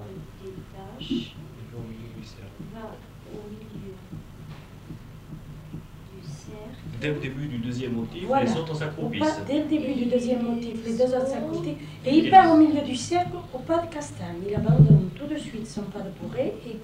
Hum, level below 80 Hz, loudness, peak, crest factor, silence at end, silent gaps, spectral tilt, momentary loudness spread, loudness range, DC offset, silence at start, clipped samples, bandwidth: none; -48 dBFS; -24 LUFS; -4 dBFS; 22 dB; 0 s; none; -7 dB/octave; 23 LU; 20 LU; under 0.1%; 0 s; under 0.1%; 10.5 kHz